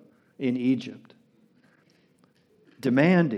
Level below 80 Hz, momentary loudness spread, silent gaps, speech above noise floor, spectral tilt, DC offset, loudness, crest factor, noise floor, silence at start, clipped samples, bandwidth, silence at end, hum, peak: -84 dBFS; 11 LU; none; 40 dB; -8 dB/octave; under 0.1%; -25 LUFS; 20 dB; -63 dBFS; 0.4 s; under 0.1%; 12.5 kHz; 0 s; none; -8 dBFS